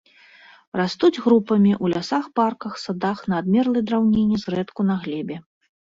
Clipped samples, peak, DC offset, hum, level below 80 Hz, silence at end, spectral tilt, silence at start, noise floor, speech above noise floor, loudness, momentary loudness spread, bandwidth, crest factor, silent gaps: under 0.1%; -6 dBFS; under 0.1%; none; -56 dBFS; 0.55 s; -7 dB/octave; 0.75 s; -50 dBFS; 29 dB; -21 LUFS; 11 LU; 7.6 kHz; 16 dB; none